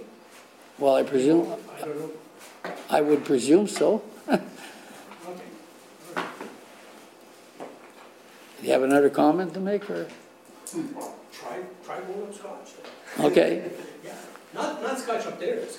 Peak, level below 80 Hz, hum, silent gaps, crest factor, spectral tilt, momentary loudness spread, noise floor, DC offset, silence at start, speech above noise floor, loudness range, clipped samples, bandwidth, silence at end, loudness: -6 dBFS; -74 dBFS; none; none; 22 dB; -5 dB/octave; 23 LU; -50 dBFS; under 0.1%; 0 s; 26 dB; 15 LU; under 0.1%; 16.5 kHz; 0 s; -25 LUFS